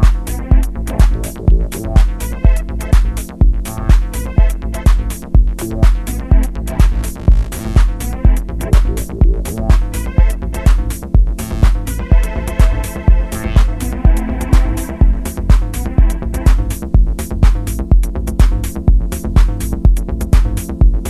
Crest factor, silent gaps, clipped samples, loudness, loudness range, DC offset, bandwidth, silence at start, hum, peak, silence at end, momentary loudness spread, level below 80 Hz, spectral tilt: 12 dB; none; under 0.1%; -16 LUFS; 1 LU; under 0.1%; 13.5 kHz; 0 s; none; 0 dBFS; 0 s; 4 LU; -12 dBFS; -6.5 dB/octave